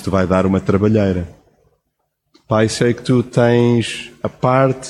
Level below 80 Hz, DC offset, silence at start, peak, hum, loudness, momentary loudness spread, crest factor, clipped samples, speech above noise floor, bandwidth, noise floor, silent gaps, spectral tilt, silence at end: -44 dBFS; under 0.1%; 0 s; -2 dBFS; none; -16 LUFS; 10 LU; 16 dB; under 0.1%; 56 dB; 12 kHz; -71 dBFS; none; -6.5 dB/octave; 0 s